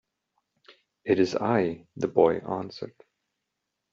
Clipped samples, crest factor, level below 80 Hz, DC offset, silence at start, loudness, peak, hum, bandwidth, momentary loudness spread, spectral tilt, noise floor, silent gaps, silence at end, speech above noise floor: under 0.1%; 22 dB; -68 dBFS; under 0.1%; 1.05 s; -26 LUFS; -6 dBFS; none; 7.6 kHz; 16 LU; -5.5 dB/octave; -83 dBFS; none; 1.05 s; 57 dB